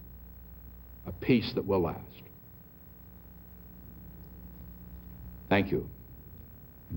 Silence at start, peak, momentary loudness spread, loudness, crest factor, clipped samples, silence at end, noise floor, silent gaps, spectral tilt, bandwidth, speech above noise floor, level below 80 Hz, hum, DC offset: 0 s; -10 dBFS; 22 LU; -30 LUFS; 26 dB; under 0.1%; 0 s; -52 dBFS; none; -8.5 dB/octave; 16 kHz; 23 dB; -52 dBFS; none; under 0.1%